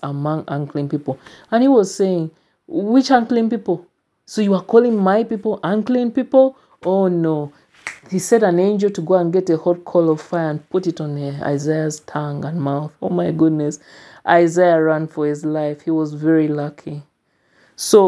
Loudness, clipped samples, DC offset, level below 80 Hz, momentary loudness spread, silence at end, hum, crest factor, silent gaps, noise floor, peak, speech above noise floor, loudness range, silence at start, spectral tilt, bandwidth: -18 LUFS; under 0.1%; under 0.1%; -66 dBFS; 12 LU; 0 s; none; 18 dB; none; -61 dBFS; 0 dBFS; 44 dB; 4 LU; 0 s; -6.5 dB/octave; 11 kHz